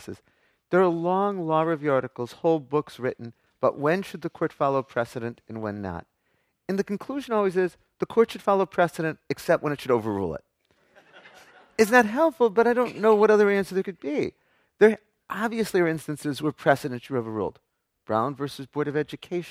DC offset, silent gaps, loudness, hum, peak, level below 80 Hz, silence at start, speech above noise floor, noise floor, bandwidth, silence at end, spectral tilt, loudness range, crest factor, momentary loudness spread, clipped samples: under 0.1%; none; -25 LUFS; none; -4 dBFS; -64 dBFS; 0 s; 47 dB; -72 dBFS; 15.5 kHz; 0 s; -6 dB/octave; 7 LU; 22 dB; 14 LU; under 0.1%